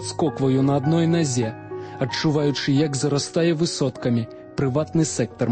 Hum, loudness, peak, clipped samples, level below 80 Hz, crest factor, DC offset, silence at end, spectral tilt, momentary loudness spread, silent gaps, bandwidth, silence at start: none; -22 LUFS; -8 dBFS; under 0.1%; -54 dBFS; 14 dB; under 0.1%; 0 s; -5.5 dB/octave; 7 LU; none; 8.8 kHz; 0 s